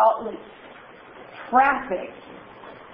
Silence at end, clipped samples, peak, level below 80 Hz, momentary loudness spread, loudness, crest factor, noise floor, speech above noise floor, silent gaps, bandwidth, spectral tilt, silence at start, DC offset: 0.1 s; under 0.1%; -6 dBFS; -60 dBFS; 25 LU; -22 LUFS; 18 dB; -45 dBFS; 22 dB; none; 5.6 kHz; -8.5 dB/octave; 0 s; under 0.1%